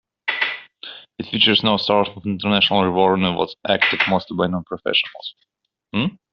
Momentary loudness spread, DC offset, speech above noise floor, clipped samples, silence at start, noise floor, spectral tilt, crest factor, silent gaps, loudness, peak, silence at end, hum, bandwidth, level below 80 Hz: 17 LU; under 0.1%; 20 dB; under 0.1%; 0.25 s; -40 dBFS; -2 dB/octave; 20 dB; none; -19 LUFS; 0 dBFS; 0.15 s; none; 6.4 kHz; -56 dBFS